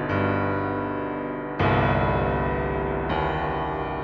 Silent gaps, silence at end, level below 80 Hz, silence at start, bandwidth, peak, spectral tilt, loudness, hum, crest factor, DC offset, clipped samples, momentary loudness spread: none; 0 s; -38 dBFS; 0 s; 6.2 kHz; -10 dBFS; -9 dB/octave; -25 LUFS; 50 Hz at -50 dBFS; 14 dB; under 0.1%; under 0.1%; 7 LU